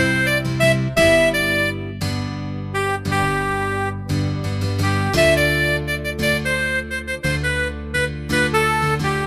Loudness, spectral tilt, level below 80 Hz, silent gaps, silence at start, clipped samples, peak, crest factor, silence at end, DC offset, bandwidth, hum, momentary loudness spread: -19 LUFS; -5 dB/octave; -34 dBFS; none; 0 s; under 0.1%; -4 dBFS; 16 dB; 0 s; under 0.1%; 15.5 kHz; none; 9 LU